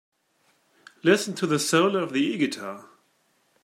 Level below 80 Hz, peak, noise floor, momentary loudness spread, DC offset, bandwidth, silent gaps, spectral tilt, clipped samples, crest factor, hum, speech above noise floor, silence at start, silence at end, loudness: -74 dBFS; -4 dBFS; -68 dBFS; 14 LU; under 0.1%; 16 kHz; none; -4 dB/octave; under 0.1%; 22 dB; none; 44 dB; 1.05 s; 0.8 s; -24 LUFS